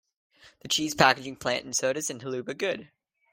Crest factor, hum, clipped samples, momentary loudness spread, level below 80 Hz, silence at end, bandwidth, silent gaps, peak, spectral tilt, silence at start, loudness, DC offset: 26 dB; none; under 0.1%; 12 LU; -66 dBFS; 0.45 s; 16 kHz; none; -4 dBFS; -2.5 dB/octave; 0.45 s; -27 LUFS; under 0.1%